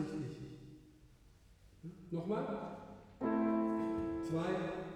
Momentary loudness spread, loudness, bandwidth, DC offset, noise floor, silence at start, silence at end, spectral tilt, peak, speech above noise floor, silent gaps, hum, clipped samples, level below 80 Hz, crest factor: 20 LU; -39 LUFS; 11 kHz; under 0.1%; -63 dBFS; 0 s; 0 s; -8 dB/octave; -24 dBFS; 25 dB; none; none; under 0.1%; -64 dBFS; 16 dB